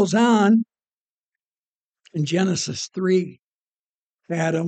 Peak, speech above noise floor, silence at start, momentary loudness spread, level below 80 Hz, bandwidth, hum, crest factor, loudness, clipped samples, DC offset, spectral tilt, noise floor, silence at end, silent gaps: -6 dBFS; over 70 dB; 0 s; 15 LU; -72 dBFS; 9 kHz; none; 16 dB; -21 LUFS; under 0.1%; under 0.1%; -5.5 dB/octave; under -90 dBFS; 0 s; 0.98-1.32 s, 1.45-1.94 s, 3.44-4.19 s